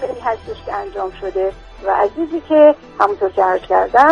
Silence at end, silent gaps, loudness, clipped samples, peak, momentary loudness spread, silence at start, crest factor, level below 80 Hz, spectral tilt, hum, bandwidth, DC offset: 0 s; none; -16 LUFS; under 0.1%; 0 dBFS; 14 LU; 0 s; 16 dB; -44 dBFS; -6 dB/octave; none; 7.2 kHz; under 0.1%